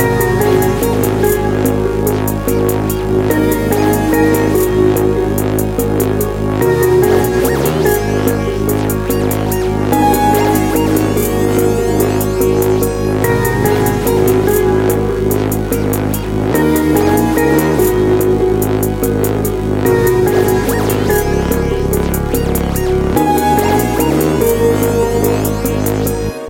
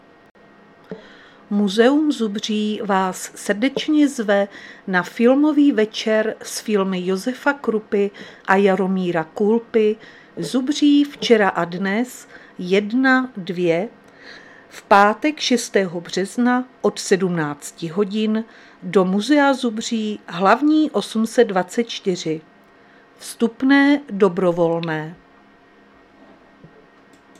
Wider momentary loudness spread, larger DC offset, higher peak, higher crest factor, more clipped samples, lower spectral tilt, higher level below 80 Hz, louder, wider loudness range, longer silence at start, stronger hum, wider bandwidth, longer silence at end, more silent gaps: second, 4 LU vs 12 LU; neither; about the same, 0 dBFS vs 0 dBFS; second, 12 dB vs 20 dB; neither; about the same, -6 dB/octave vs -5 dB/octave; first, -26 dBFS vs -66 dBFS; first, -13 LUFS vs -19 LUFS; about the same, 1 LU vs 3 LU; second, 0 s vs 0.9 s; neither; first, 17.5 kHz vs 14 kHz; second, 0 s vs 2.25 s; neither